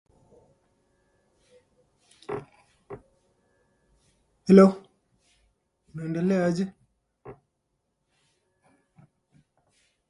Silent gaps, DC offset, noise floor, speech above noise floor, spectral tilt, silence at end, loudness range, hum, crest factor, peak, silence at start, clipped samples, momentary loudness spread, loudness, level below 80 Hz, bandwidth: none; under 0.1%; -78 dBFS; 58 dB; -8.5 dB/octave; 2.75 s; 21 LU; none; 26 dB; -4 dBFS; 2.3 s; under 0.1%; 31 LU; -23 LUFS; -68 dBFS; 11 kHz